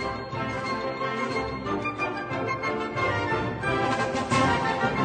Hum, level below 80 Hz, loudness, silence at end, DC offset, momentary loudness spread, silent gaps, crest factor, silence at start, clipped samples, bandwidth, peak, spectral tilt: none; -48 dBFS; -27 LUFS; 0 s; under 0.1%; 6 LU; none; 16 dB; 0 s; under 0.1%; 9.4 kHz; -10 dBFS; -5.5 dB/octave